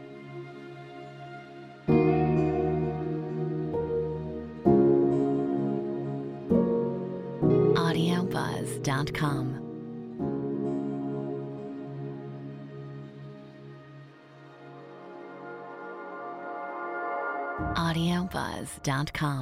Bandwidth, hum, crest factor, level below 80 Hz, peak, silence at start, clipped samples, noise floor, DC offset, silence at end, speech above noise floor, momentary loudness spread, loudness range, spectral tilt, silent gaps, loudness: 15.5 kHz; none; 20 dB; -52 dBFS; -8 dBFS; 0 s; under 0.1%; -50 dBFS; under 0.1%; 0 s; 20 dB; 20 LU; 16 LU; -7 dB/octave; none; -29 LUFS